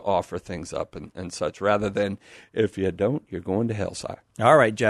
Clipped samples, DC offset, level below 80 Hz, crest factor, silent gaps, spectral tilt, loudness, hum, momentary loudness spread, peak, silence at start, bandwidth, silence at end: under 0.1%; under 0.1%; -54 dBFS; 20 dB; none; -6 dB/octave; -25 LUFS; none; 16 LU; -4 dBFS; 0 s; 12 kHz; 0 s